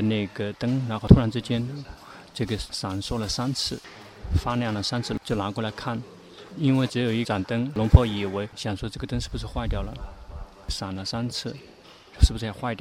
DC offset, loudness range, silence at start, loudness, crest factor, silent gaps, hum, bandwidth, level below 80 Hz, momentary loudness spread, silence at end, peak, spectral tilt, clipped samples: under 0.1%; 7 LU; 0 s; -26 LUFS; 26 dB; none; none; 14.5 kHz; -32 dBFS; 22 LU; 0.05 s; 0 dBFS; -6 dB/octave; under 0.1%